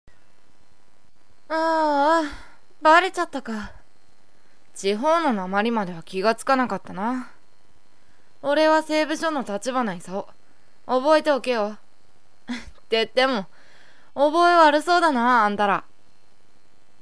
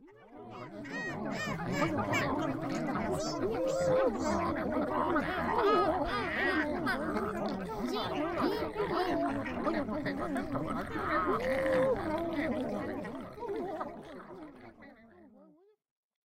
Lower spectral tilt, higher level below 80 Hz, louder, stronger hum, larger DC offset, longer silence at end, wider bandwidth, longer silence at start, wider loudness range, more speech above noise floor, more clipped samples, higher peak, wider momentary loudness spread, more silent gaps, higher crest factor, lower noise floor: second, -4 dB/octave vs -5.5 dB/octave; about the same, -58 dBFS vs -54 dBFS; first, -21 LUFS vs -33 LUFS; neither; first, 1% vs under 0.1%; first, 1.2 s vs 0.8 s; second, 11 kHz vs 16 kHz; first, 1.5 s vs 0 s; about the same, 5 LU vs 6 LU; first, 42 dB vs 31 dB; neither; first, -4 dBFS vs -16 dBFS; first, 16 LU vs 13 LU; neither; about the same, 20 dB vs 16 dB; about the same, -63 dBFS vs -63 dBFS